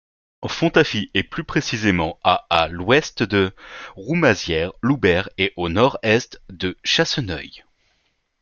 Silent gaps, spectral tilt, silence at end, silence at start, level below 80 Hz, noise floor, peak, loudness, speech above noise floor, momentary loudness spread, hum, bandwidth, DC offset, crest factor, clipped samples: none; -5 dB/octave; 0.85 s; 0.4 s; -48 dBFS; -67 dBFS; 0 dBFS; -20 LUFS; 47 dB; 11 LU; none; 7.2 kHz; under 0.1%; 20 dB; under 0.1%